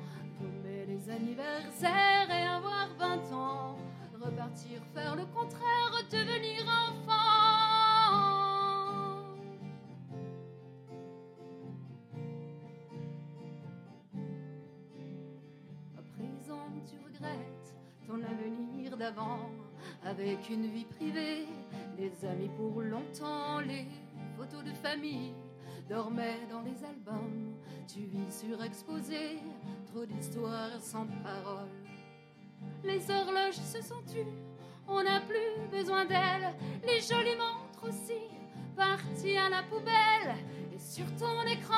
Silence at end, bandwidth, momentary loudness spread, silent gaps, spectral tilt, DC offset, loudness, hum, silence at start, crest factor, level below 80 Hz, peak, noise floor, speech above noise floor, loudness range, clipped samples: 0 s; 16 kHz; 20 LU; none; -4.5 dB/octave; under 0.1%; -34 LUFS; none; 0 s; 22 dB; -86 dBFS; -14 dBFS; -56 dBFS; 21 dB; 19 LU; under 0.1%